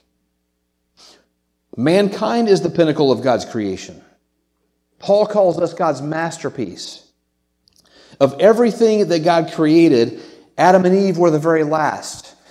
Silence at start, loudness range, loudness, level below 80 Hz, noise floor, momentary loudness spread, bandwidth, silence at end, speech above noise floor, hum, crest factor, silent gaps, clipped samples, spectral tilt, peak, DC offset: 1.75 s; 6 LU; -16 LUFS; -64 dBFS; -69 dBFS; 17 LU; 13 kHz; 0.3 s; 54 dB; none; 16 dB; none; under 0.1%; -6 dB/octave; 0 dBFS; under 0.1%